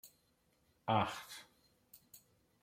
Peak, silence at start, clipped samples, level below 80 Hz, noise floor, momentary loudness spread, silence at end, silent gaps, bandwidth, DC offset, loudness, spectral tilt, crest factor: -18 dBFS; 0.05 s; under 0.1%; -76 dBFS; -76 dBFS; 26 LU; 0.45 s; none; 16.5 kHz; under 0.1%; -38 LUFS; -5 dB/octave; 24 dB